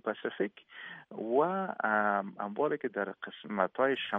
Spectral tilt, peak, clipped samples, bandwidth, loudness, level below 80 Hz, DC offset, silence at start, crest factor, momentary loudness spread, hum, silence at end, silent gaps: -8 dB/octave; -12 dBFS; under 0.1%; 3.9 kHz; -32 LUFS; -78 dBFS; under 0.1%; 0.05 s; 20 dB; 15 LU; none; 0 s; none